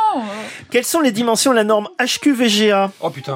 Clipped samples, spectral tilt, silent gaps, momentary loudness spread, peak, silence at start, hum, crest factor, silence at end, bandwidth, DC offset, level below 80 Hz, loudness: under 0.1%; -3 dB/octave; none; 10 LU; -2 dBFS; 0 s; none; 14 dB; 0 s; 16.5 kHz; under 0.1%; -66 dBFS; -16 LUFS